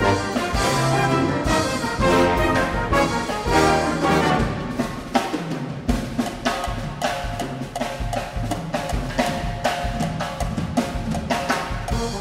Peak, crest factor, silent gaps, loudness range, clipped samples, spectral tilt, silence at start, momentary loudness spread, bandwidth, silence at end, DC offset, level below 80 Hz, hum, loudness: -2 dBFS; 20 dB; none; 6 LU; under 0.1%; -5 dB/octave; 0 s; 9 LU; 16 kHz; 0 s; under 0.1%; -32 dBFS; none; -22 LUFS